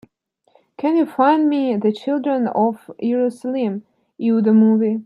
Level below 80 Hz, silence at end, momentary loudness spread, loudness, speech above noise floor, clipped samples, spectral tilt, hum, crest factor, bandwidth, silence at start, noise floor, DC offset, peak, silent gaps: -72 dBFS; 0 s; 10 LU; -18 LUFS; 47 dB; under 0.1%; -8.5 dB/octave; none; 16 dB; 10.5 kHz; 0.8 s; -64 dBFS; under 0.1%; -2 dBFS; none